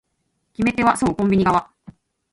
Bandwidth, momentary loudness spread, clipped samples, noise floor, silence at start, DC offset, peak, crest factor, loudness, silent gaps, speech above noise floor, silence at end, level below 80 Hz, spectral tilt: 11.5 kHz; 6 LU; under 0.1%; -71 dBFS; 0.6 s; under 0.1%; -4 dBFS; 16 dB; -19 LUFS; none; 53 dB; 0.7 s; -46 dBFS; -6 dB/octave